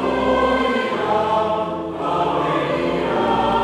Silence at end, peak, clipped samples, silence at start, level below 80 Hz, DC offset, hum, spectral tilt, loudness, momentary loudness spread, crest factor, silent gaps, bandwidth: 0 s; -6 dBFS; under 0.1%; 0 s; -42 dBFS; under 0.1%; none; -6 dB/octave; -19 LUFS; 5 LU; 14 dB; none; 12.5 kHz